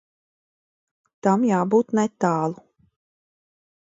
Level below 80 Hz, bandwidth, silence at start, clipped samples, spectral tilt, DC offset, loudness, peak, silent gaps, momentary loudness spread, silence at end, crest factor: -70 dBFS; 7.8 kHz; 1.25 s; under 0.1%; -7.5 dB/octave; under 0.1%; -22 LUFS; -6 dBFS; none; 8 LU; 1.3 s; 20 dB